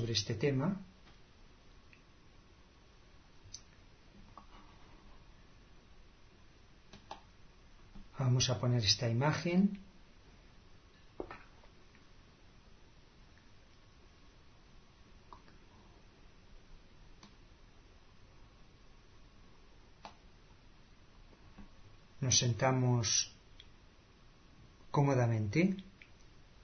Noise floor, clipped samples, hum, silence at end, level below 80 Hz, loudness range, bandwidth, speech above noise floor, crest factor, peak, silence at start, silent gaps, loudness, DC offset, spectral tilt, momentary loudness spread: -61 dBFS; under 0.1%; none; 0.5 s; -60 dBFS; 24 LU; 6.4 kHz; 29 dB; 26 dB; -14 dBFS; 0 s; none; -33 LUFS; under 0.1%; -5 dB/octave; 28 LU